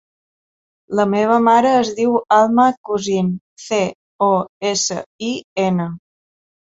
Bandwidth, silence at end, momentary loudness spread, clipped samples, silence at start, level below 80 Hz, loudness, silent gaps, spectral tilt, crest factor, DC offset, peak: 8 kHz; 0.7 s; 12 LU; under 0.1%; 0.9 s; -60 dBFS; -17 LUFS; 2.77-2.84 s, 3.41-3.57 s, 3.95-4.19 s, 4.49-4.61 s, 5.06-5.19 s, 5.44-5.56 s; -4.5 dB/octave; 16 dB; under 0.1%; -2 dBFS